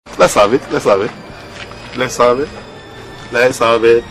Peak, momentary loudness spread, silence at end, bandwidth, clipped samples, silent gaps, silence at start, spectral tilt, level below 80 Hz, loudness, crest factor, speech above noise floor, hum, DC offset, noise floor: 0 dBFS; 21 LU; 0 s; 14.5 kHz; under 0.1%; none; 0.05 s; -4 dB/octave; -42 dBFS; -13 LUFS; 14 dB; 20 dB; none; under 0.1%; -32 dBFS